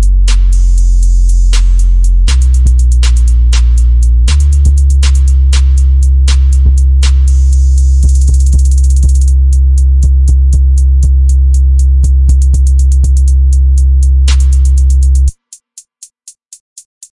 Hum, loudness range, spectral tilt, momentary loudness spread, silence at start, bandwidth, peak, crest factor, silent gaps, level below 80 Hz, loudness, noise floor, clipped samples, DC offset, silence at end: none; 1 LU; -5 dB/octave; 2 LU; 0 s; 11.5 kHz; 0 dBFS; 6 dB; 16.60-16.76 s; -6 dBFS; -9 LUFS; -36 dBFS; under 0.1%; 0.4%; 0.35 s